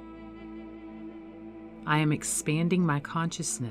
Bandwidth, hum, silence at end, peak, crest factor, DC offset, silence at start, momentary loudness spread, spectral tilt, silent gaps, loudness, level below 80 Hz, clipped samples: 15.5 kHz; none; 0 s; -12 dBFS; 20 dB; under 0.1%; 0 s; 19 LU; -4.5 dB/octave; none; -28 LUFS; -58 dBFS; under 0.1%